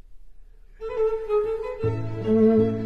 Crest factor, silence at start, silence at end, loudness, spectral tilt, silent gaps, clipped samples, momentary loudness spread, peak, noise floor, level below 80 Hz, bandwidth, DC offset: 16 dB; 0.1 s; 0 s; -24 LUFS; -10 dB/octave; none; under 0.1%; 11 LU; -8 dBFS; -45 dBFS; -46 dBFS; 5.6 kHz; under 0.1%